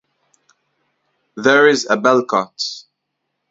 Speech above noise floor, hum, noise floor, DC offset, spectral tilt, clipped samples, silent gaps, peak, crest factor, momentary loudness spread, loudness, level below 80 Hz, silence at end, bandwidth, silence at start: 60 dB; none; -75 dBFS; under 0.1%; -3.5 dB/octave; under 0.1%; none; 0 dBFS; 18 dB; 16 LU; -15 LUFS; -66 dBFS; 0.7 s; 7.8 kHz; 1.35 s